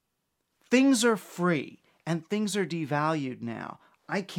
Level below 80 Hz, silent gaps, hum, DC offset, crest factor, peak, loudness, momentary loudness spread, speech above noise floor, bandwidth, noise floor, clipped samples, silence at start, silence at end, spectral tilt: -78 dBFS; none; none; under 0.1%; 18 dB; -10 dBFS; -28 LUFS; 16 LU; 52 dB; 16.5 kHz; -80 dBFS; under 0.1%; 0.7 s; 0 s; -5 dB/octave